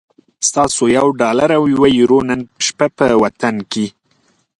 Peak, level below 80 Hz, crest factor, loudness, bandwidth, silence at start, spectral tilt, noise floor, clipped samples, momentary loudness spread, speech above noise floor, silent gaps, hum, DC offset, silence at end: 0 dBFS; -48 dBFS; 14 dB; -14 LUFS; 11.5 kHz; 0.4 s; -4 dB/octave; -58 dBFS; under 0.1%; 9 LU; 45 dB; none; none; under 0.1%; 0.7 s